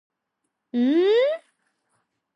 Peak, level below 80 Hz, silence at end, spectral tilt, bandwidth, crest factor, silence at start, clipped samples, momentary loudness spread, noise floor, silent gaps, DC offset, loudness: -12 dBFS; -86 dBFS; 0.95 s; -5.5 dB/octave; 7.6 kHz; 14 dB; 0.75 s; under 0.1%; 12 LU; -79 dBFS; none; under 0.1%; -21 LUFS